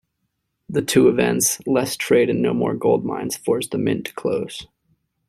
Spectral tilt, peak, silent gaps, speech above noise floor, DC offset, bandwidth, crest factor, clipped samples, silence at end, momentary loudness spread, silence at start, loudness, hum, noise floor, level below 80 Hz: -4.5 dB/octave; -2 dBFS; none; 55 dB; under 0.1%; 15.5 kHz; 18 dB; under 0.1%; 0.65 s; 10 LU; 0.7 s; -20 LUFS; none; -74 dBFS; -56 dBFS